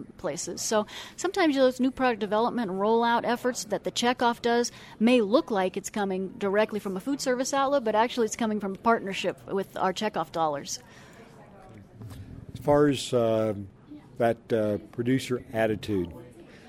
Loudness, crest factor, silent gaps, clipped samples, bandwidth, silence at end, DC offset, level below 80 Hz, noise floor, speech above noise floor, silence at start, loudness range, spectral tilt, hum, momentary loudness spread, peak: -27 LUFS; 18 dB; none; under 0.1%; 16 kHz; 0 s; under 0.1%; -58 dBFS; -49 dBFS; 23 dB; 0 s; 4 LU; -4.5 dB/octave; none; 11 LU; -10 dBFS